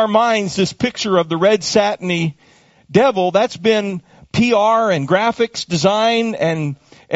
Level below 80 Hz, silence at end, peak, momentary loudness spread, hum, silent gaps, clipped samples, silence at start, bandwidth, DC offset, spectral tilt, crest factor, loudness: -52 dBFS; 0 s; 0 dBFS; 8 LU; none; none; under 0.1%; 0 s; 8 kHz; under 0.1%; -4 dB/octave; 16 dB; -16 LUFS